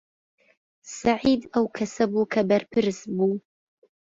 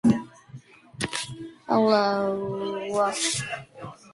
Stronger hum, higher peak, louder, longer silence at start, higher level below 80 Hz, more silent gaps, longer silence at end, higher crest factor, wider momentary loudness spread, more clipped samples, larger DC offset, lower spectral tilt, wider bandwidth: neither; about the same, -8 dBFS vs -8 dBFS; about the same, -24 LUFS vs -26 LUFS; first, 0.85 s vs 0.05 s; about the same, -60 dBFS vs -60 dBFS; neither; first, 0.75 s vs 0.2 s; about the same, 18 dB vs 18 dB; second, 5 LU vs 18 LU; neither; neither; first, -5.5 dB/octave vs -4 dB/octave; second, 7.8 kHz vs 11.5 kHz